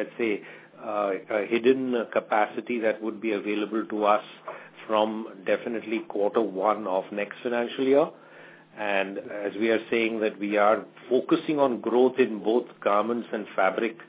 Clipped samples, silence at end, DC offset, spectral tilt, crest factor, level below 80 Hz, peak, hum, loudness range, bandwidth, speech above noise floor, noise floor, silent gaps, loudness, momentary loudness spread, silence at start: under 0.1%; 0.05 s; under 0.1%; -9 dB/octave; 20 dB; -82 dBFS; -6 dBFS; none; 3 LU; 4 kHz; 24 dB; -49 dBFS; none; -26 LUFS; 9 LU; 0 s